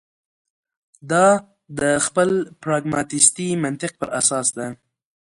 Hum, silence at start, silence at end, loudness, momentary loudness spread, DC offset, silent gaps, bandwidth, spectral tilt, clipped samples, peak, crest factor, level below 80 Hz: none; 1.05 s; 0.5 s; -19 LUFS; 11 LU; under 0.1%; none; 11.5 kHz; -3.5 dB/octave; under 0.1%; 0 dBFS; 22 dB; -60 dBFS